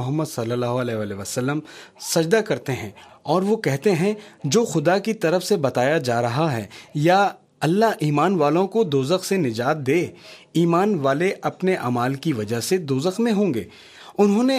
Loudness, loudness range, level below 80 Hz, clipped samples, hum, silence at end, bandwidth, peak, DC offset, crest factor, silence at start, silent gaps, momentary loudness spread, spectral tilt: -21 LUFS; 3 LU; -66 dBFS; under 0.1%; none; 0 s; 15.5 kHz; -4 dBFS; under 0.1%; 18 dB; 0 s; none; 9 LU; -5.5 dB/octave